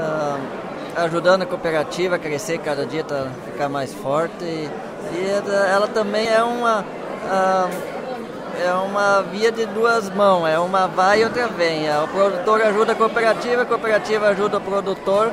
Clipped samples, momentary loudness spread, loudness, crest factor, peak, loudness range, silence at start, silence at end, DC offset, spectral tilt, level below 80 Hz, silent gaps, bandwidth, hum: under 0.1%; 11 LU; -20 LUFS; 16 dB; -4 dBFS; 5 LU; 0 s; 0 s; under 0.1%; -4.5 dB/octave; -58 dBFS; none; 16 kHz; none